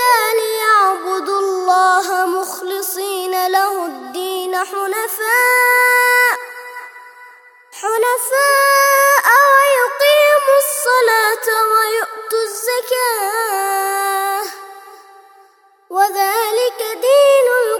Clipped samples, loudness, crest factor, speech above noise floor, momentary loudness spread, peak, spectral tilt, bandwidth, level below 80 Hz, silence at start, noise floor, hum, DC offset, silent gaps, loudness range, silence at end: under 0.1%; -14 LUFS; 14 dB; 36 dB; 11 LU; 0 dBFS; 1.5 dB/octave; over 20 kHz; -78 dBFS; 0 s; -50 dBFS; none; under 0.1%; none; 8 LU; 0 s